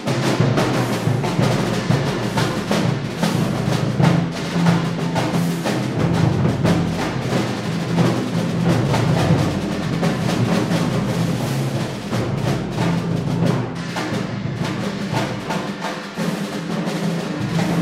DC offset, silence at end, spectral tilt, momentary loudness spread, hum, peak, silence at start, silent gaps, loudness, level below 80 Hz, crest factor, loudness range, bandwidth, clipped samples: under 0.1%; 0 s; -6 dB/octave; 6 LU; none; -4 dBFS; 0 s; none; -20 LUFS; -44 dBFS; 16 dB; 4 LU; 15.5 kHz; under 0.1%